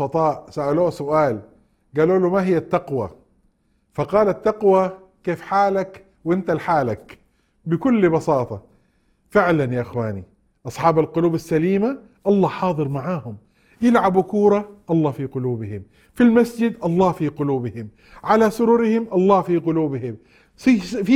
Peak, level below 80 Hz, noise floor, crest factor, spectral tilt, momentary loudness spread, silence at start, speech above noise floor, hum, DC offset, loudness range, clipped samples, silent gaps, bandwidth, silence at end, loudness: -2 dBFS; -54 dBFS; -63 dBFS; 18 dB; -8 dB/octave; 14 LU; 0 s; 44 dB; none; under 0.1%; 3 LU; under 0.1%; none; 14.5 kHz; 0 s; -20 LUFS